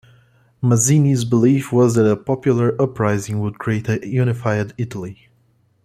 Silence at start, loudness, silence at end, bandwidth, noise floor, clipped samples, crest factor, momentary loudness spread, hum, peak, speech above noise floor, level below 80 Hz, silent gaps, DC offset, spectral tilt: 0.6 s; -18 LUFS; 0.7 s; 14.5 kHz; -59 dBFS; under 0.1%; 16 dB; 10 LU; none; -2 dBFS; 42 dB; -54 dBFS; none; under 0.1%; -6.5 dB/octave